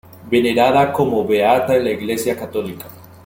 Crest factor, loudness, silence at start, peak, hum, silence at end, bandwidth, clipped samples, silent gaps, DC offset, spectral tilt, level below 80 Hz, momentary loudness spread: 16 dB; -17 LUFS; 0.2 s; -2 dBFS; none; 0.2 s; 17 kHz; under 0.1%; none; under 0.1%; -5.5 dB/octave; -56 dBFS; 12 LU